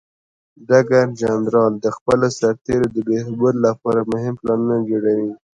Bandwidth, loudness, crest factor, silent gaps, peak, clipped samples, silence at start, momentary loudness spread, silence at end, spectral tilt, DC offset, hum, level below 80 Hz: 10.5 kHz; -18 LUFS; 18 dB; 2.01-2.06 s; 0 dBFS; under 0.1%; 0.6 s; 5 LU; 0.25 s; -7 dB/octave; under 0.1%; none; -52 dBFS